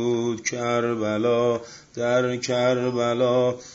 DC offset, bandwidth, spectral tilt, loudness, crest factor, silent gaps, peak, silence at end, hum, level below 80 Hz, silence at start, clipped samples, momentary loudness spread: under 0.1%; 8 kHz; -5 dB/octave; -23 LUFS; 14 dB; none; -10 dBFS; 0 s; none; -64 dBFS; 0 s; under 0.1%; 5 LU